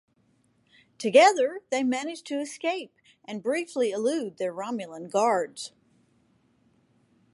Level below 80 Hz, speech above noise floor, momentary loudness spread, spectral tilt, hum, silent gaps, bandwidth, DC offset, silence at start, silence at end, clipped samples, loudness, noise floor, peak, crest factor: -84 dBFS; 41 dB; 16 LU; -3.5 dB/octave; none; none; 11.5 kHz; under 0.1%; 1 s; 1.65 s; under 0.1%; -26 LUFS; -67 dBFS; -6 dBFS; 22 dB